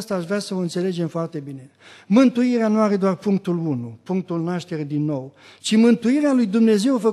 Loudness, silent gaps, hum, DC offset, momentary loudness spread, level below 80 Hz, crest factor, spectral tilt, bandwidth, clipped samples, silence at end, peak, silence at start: -20 LUFS; none; none; under 0.1%; 13 LU; -72 dBFS; 16 dB; -6.5 dB/octave; 12.5 kHz; under 0.1%; 0 s; -4 dBFS; 0 s